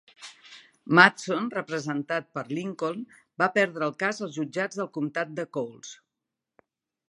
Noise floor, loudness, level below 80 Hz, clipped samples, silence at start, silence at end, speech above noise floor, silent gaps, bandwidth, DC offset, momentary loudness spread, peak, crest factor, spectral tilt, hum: -86 dBFS; -26 LUFS; -80 dBFS; under 0.1%; 0.2 s; 1.15 s; 60 dB; none; 11.5 kHz; under 0.1%; 25 LU; -2 dBFS; 26 dB; -5 dB/octave; none